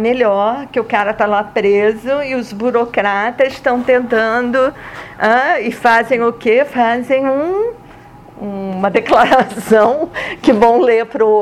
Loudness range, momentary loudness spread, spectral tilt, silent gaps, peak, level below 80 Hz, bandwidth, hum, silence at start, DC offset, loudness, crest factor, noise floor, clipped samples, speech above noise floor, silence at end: 2 LU; 8 LU; -5.5 dB/octave; none; -2 dBFS; -48 dBFS; 14 kHz; none; 0 s; under 0.1%; -14 LUFS; 12 dB; -38 dBFS; under 0.1%; 24 dB; 0 s